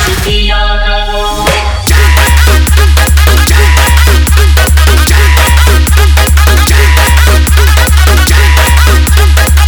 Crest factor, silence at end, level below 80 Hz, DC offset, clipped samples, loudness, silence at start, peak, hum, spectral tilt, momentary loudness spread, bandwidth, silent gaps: 4 dB; 0 s; -6 dBFS; under 0.1%; 4%; -6 LUFS; 0 s; 0 dBFS; none; -4 dB/octave; 4 LU; over 20 kHz; none